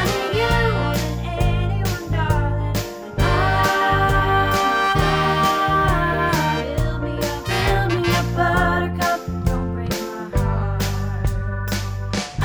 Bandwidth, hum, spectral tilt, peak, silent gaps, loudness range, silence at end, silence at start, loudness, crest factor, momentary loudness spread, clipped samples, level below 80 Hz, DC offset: over 20 kHz; none; -5.5 dB/octave; -4 dBFS; none; 4 LU; 0 s; 0 s; -20 LUFS; 14 dB; 8 LU; under 0.1%; -28 dBFS; under 0.1%